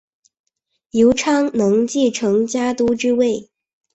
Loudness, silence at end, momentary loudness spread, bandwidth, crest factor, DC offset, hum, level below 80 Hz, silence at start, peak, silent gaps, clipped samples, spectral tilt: -17 LUFS; 0.5 s; 5 LU; 8.2 kHz; 14 dB; under 0.1%; none; -52 dBFS; 0.95 s; -4 dBFS; none; under 0.1%; -4.5 dB/octave